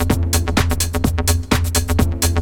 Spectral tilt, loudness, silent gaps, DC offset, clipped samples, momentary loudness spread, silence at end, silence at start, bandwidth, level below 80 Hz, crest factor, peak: -4.5 dB/octave; -18 LUFS; none; under 0.1%; under 0.1%; 2 LU; 0 s; 0 s; over 20 kHz; -24 dBFS; 16 dB; 0 dBFS